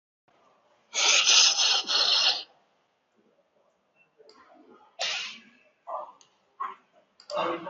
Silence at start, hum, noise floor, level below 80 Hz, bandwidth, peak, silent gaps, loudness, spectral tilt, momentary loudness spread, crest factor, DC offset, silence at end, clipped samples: 0.95 s; none; -71 dBFS; -88 dBFS; 8 kHz; -8 dBFS; none; -22 LUFS; 3.5 dB/octave; 22 LU; 22 dB; under 0.1%; 0 s; under 0.1%